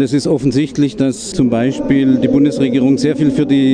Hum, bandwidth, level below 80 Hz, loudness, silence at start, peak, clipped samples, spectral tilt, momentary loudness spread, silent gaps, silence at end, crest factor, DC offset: none; 10 kHz; -42 dBFS; -14 LUFS; 0 s; -2 dBFS; under 0.1%; -6.5 dB/octave; 4 LU; none; 0 s; 12 dB; under 0.1%